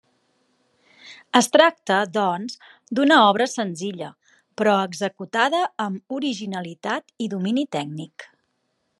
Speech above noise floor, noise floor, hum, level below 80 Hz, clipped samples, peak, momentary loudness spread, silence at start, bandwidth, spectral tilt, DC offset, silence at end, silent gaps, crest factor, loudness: 51 dB; -72 dBFS; none; -78 dBFS; under 0.1%; 0 dBFS; 17 LU; 1.05 s; 12.5 kHz; -4 dB/octave; under 0.1%; 0.75 s; none; 22 dB; -21 LUFS